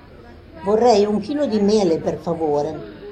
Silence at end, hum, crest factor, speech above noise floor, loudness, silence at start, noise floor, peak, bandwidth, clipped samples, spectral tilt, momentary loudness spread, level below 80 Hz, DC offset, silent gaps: 0 s; none; 16 dB; 24 dB; -19 LUFS; 0.1 s; -42 dBFS; -4 dBFS; 9.8 kHz; under 0.1%; -6.5 dB/octave; 11 LU; -48 dBFS; under 0.1%; none